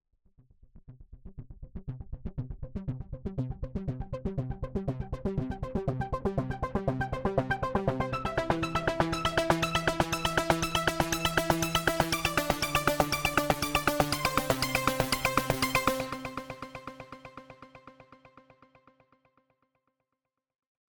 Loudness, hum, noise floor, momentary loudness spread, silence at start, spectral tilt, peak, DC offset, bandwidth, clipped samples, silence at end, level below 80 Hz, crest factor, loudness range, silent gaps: -30 LUFS; none; -86 dBFS; 16 LU; 0.75 s; -4.5 dB/octave; -4 dBFS; under 0.1%; 19 kHz; under 0.1%; 2.55 s; -44 dBFS; 28 dB; 13 LU; none